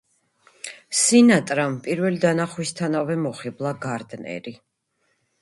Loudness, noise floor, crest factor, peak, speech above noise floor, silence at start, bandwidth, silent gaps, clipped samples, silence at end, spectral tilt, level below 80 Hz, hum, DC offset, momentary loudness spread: -21 LUFS; -71 dBFS; 18 dB; -4 dBFS; 49 dB; 0.65 s; 11.5 kHz; none; under 0.1%; 0.85 s; -4.5 dB/octave; -66 dBFS; none; under 0.1%; 19 LU